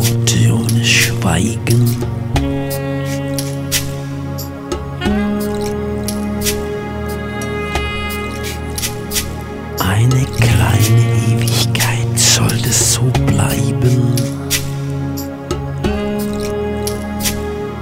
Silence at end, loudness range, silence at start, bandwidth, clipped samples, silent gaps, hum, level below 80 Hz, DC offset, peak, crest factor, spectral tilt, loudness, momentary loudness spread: 0 s; 7 LU; 0 s; 16.5 kHz; under 0.1%; none; none; -30 dBFS; under 0.1%; 0 dBFS; 16 dB; -4.5 dB/octave; -16 LUFS; 11 LU